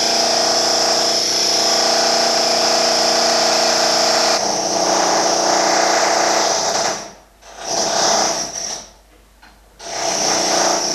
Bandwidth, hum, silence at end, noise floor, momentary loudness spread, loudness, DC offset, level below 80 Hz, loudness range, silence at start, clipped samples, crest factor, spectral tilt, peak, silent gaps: 14 kHz; none; 0 s; -48 dBFS; 8 LU; -15 LUFS; under 0.1%; -54 dBFS; 6 LU; 0 s; under 0.1%; 14 dB; -0.5 dB/octave; -2 dBFS; none